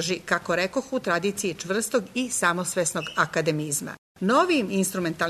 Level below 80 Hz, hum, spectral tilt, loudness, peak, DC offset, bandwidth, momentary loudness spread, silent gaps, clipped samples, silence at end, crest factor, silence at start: -62 dBFS; none; -3.5 dB/octave; -25 LUFS; -8 dBFS; under 0.1%; 13.5 kHz; 6 LU; 3.98-4.15 s; under 0.1%; 0 s; 18 dB; 0 s